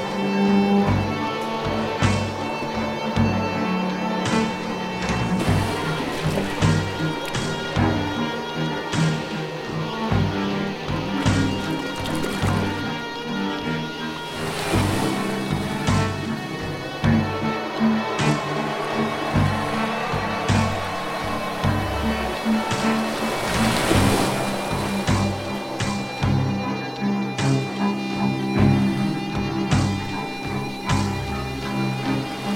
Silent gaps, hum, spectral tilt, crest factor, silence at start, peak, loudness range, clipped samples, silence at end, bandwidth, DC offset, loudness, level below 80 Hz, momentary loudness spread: none; none; -5.5 dB/octave; 18 dB; 0 s; -6 dBFS; 3 LU; under 0.1%; 0 s; 16.5 kHz; under 0.1%; -23 LUFS; -40 dBFS; 6 LU